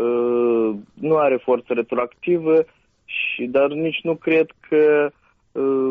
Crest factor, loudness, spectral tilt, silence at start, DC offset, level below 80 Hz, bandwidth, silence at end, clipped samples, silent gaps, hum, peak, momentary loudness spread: 12 dB; -20 LUFS; -4.5 dB/octave; 0 s; under 0.1%; -64 dBFS; 3.8 kHz; 0 s; under 0.1%; none; none; -8 dBFS; 7 LU